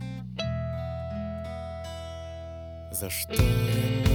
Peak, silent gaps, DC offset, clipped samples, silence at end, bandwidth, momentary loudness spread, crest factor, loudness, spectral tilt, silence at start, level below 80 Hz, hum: -8 dBFS; none; under 0.1%; under 0.1%; 0 s; 19.5 kHz; 14 LU; 20 dB; -31 LUFS; -5.5 dB/octave; 0 s; -38 dBFS; none